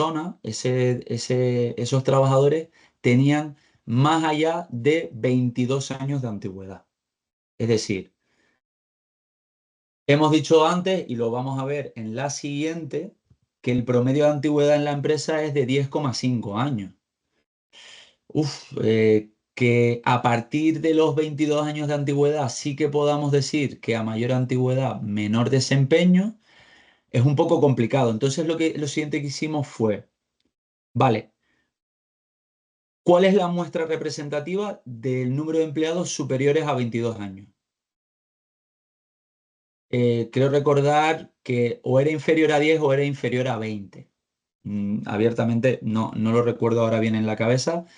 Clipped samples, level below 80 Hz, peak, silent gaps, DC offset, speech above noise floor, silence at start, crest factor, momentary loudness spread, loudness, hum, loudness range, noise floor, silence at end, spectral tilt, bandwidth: under 0.1%; -66 dBFS; -6 dBFS; 7.33-7.58 s, 8.65-10.06 s, 17.46-17.70 s, 30.58-30.95 s, 31.82-33.05 s, 37.96-39.89 s, 44.55-44.59 s; under 0.1%; 53 dB; 0 s; 18 dB; 10 LU; -22 LUFS; none; 6 LU; -75 dBFS; 0.15 s; -6.5 dB/octave; 10.5 kHz